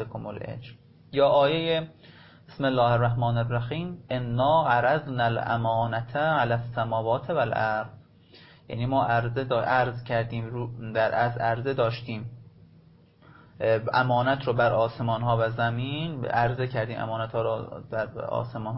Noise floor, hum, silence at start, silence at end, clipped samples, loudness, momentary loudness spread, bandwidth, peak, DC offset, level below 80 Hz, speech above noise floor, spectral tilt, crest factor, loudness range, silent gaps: -55 dBFS; none; 0 s; 0 s; under 0.1%; -26 LUFS; 11 LU; 5.8 kHz; -10 dBFS; under 0.1%; -54 dBFS; 30 dB; -10.5 dB/octave; 16 dB; 3 LU; none